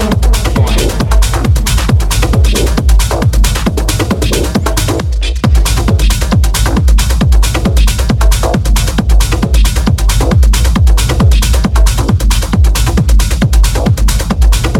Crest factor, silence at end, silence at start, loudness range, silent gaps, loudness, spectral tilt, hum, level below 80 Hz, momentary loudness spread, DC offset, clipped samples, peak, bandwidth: 8 dB; 0 s; 0 s; 2 LU; none; -11 LUFS; -5 dB/octave; none; -10 dBFS; 3 LU; under 0.1%; under 0.1%; 0 dBFS; 16 kHz